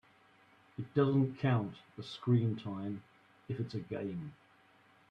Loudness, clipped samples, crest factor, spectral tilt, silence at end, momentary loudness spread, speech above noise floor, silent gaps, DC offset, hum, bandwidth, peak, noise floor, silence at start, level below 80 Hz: -35 LUFS; under 0.1%; 20 dB; -9 dB/octave; 0.8 s; 17 LU; 31 dB; none; under 0.1%; none; 6.6 kHz; -18 dBFS; -66 dBFS; 0.8 s; -72 dBFS